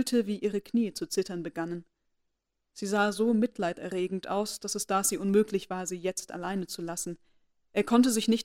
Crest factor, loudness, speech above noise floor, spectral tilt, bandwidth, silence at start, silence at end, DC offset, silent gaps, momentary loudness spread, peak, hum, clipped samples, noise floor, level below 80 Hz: 18 dB; -30 LUFS; 51 dB; -4 dB/octave; 16 kHz; 0 s; 0 s; under 0.1%; none; 10 LU; -12 dBFS; none; under 0.1%; -80 dBFS; -66 dBFS